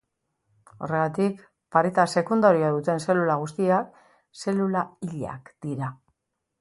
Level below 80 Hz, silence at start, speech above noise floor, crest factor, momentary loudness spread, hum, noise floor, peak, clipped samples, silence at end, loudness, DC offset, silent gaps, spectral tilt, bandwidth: -66 dBFS; 0.8 s; 54 dB; 20 dB; 15 LU; none; -78 dBFS; -4 dBFS; under 0.1%; 0.65 s; -25 LUFS; under 0.1%; none; -6.5 dB/octave; 11.5 kHz